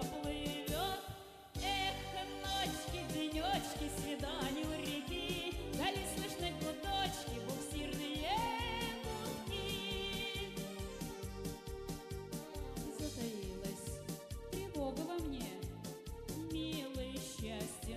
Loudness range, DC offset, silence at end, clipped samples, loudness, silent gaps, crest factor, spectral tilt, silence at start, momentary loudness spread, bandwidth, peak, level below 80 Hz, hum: 5 LU; under 0.1%; 0 s; under 0.1%; -41 LUFS; none; 16 dB; -4 dB/octave; 0 s; 8 LU; 15 kHz; -26 dBFS; -52 dBFS; none